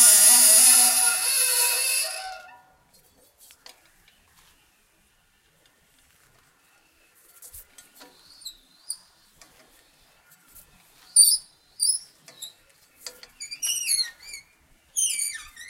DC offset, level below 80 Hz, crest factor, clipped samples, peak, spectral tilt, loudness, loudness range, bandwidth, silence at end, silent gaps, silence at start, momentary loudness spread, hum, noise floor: under 0.1%; -68 dBFS; 26 dB; under 0.1%; 0 dBFS; 3.5 dB/octave; -18 LUFS; 25 LU; 16 kHz; 0.05 s; none; 0 s; 29 LU; none; -64 dBFS